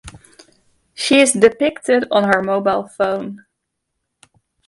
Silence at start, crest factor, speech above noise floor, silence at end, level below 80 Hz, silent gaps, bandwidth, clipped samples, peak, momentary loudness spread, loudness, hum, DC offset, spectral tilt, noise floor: 0.05 s; 18 dB; 60 dB; 1.3 s; -54 dBFS; none; 11.5 kHz; under 0.1%; 0 dBFS; 10 LU; -16 LUFS; none; under 0.1%; -3.5 dB/octave; -76 dBFS